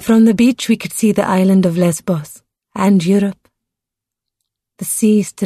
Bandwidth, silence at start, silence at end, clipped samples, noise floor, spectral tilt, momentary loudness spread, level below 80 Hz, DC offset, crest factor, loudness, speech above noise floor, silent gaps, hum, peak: 13.5 kHz; 0 s; 0 s; under 0.1%; -83 dBFS; -6 dB/octave; 10 LU; -54 dBFS; under 0.1%; 12 dB; -14 LUFS; 70 dB; none; none; -2 dBFS